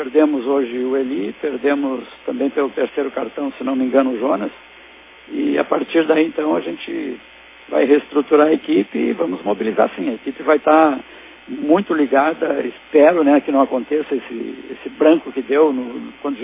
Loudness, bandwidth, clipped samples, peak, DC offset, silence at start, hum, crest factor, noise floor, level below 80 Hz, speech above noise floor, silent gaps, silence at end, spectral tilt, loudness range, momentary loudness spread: -18 LUFS; 3.9 kHz; under 0.1%; 0 dBFS; under 0.1%; 0 s; none; 18 dB; -43 dBFS; -62 dBFS; 26 dB; none; 0 s; -9.5 dB/octave; 5 LU; 13 LU